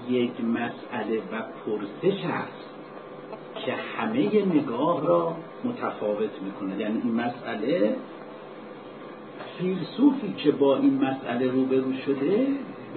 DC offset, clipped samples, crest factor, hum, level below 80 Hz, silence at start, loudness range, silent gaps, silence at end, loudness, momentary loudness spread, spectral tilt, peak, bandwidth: under 0.1%; under 0.1%; 20 dB; none; -76 dBFS; 0 s; 6 LU; none; 0 s; -26 LUFS; 19 LU; -11 dB/octave; -8 dBFS; 4.5 kHz